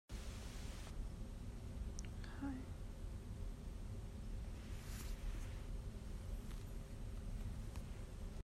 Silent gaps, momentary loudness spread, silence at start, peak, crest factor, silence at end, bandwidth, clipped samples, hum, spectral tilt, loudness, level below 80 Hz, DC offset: none; 3 LU; 0.1 s; -32 dBFS; 16 dB; 0 s; 15 kHz; under 0.1%; none; -5.5 dB/octave; -51 LUFS; -50 dBFS; under 0.1%